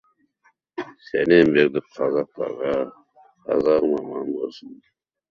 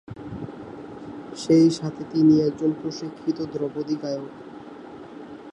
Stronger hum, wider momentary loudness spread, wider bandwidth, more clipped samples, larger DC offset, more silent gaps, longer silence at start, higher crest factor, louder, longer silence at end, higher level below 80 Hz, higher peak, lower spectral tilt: neither; second, 19 LU vs 23 LU; second, 6.8 kHz vs 10 kHz; neither; neither; neither; first, 0.75 s vs 0.1 s; about the same, 20 dB vs 18 dB; about the same, -21 LUFS vs -23 LUFS; first, 0.55 s vs 0 s; about the same, -60 dBFS vs -60 dBFS; first, -2 dBFS vs -8 dBFS; about the same, -7.5 dB/octave vs -7 dB/octave